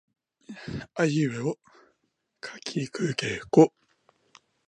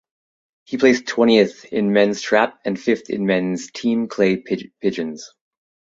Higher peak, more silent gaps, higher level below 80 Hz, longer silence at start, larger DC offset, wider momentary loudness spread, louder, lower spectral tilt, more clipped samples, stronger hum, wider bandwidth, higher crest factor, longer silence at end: about the same, -4 dBFS vs -2 dBFS; neither; about the same, -62 dBFS vs -62 dBFS; second, 0.5 s vs 0.7 s; neither; first, 21 LU vs 10 LU; second, -26 LUFS vs -19 LUFS; about the same, -6 dB/octave vs -5.5 dB/octave; neither; neither; first, 10.5 kHz vs 7.8 kHz; first, 24 dB vs 18 dB; first, 1 s vs 0.7 s